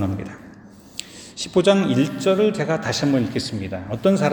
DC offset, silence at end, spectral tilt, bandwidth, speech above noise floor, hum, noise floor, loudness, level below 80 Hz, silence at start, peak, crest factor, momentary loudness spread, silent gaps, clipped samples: under 0.1%; 0 s; -5.5 dB/octave; over 20 kHz; 24 dB; none; -44 dBFS; -21 LUFS; -54 dBFS; 0 s; -4 dBFS; 16 dB; 18 LU; none; under 0.1%